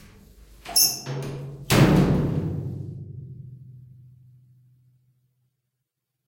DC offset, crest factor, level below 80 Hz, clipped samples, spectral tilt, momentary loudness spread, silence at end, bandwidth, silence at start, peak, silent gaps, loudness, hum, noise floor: under 0.1%; 22 dB; -44 dBFS; under 0.1%; -4.5 dB/octave; 24 LU; 2.4 s; 16.5 kHz; 0.4 s; -4 dBFS; none; -22 LUFS; none; -81 dBFS